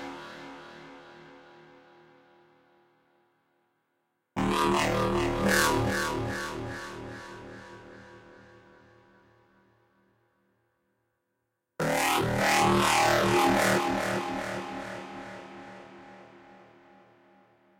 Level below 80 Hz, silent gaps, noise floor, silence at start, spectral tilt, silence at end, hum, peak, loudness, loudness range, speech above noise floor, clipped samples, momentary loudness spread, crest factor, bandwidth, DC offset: -52 dBFS; none; -81 dBFS; 0 s; -4 dB/octave; 1.4 s; none; -8 dBFS; -27 LUFS; 18 LU; 53 dB; under 0.1%; 25 LU; 24 dB; 16 kHz; under 0.1%